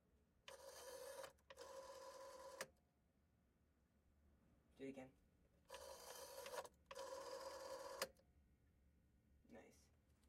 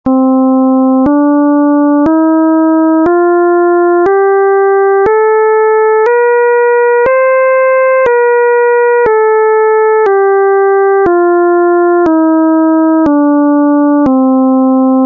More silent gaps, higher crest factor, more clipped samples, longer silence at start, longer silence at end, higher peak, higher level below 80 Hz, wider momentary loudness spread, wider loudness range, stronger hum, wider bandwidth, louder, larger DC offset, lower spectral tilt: neither; first, 28 dB vs 6 dB; neither; about the same, 0.05 s vs 0.05 s; about the same, 0 s vs 0 s; second, -32 dBFS vs -2 dBFS; second, -82 dBFS vs -46 dBFS; first, 11 LU vs 0 LU; first, 7 LU vs 0 LU; neither; first, 16 kHz vs 3.6 kHz; second, -57 LUFS vs -8 LUFS; neither; second, -2 dB/octave vs -9 dB/octave